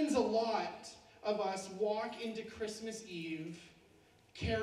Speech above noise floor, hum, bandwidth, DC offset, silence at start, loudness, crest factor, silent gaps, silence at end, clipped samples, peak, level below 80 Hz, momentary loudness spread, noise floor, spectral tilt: 28 dB; none; 14 kHz; under 0.1%; 0 s; -39 LUFS; 18 dB; none; 0 s; under 0.1%; -20 dBFS; -60 dBFS; 16 LU; -66 dBFS; -5 dB/octave